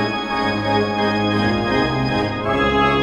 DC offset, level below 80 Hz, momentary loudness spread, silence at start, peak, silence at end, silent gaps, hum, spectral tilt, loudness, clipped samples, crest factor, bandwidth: under 0.1%; -38 dBFS; 4 LU; 0 s; -6 dBFS; 0 s; none; none; -6 dB/octave; -19 LUFS; under 0.1%; 14 dB; 11 kHz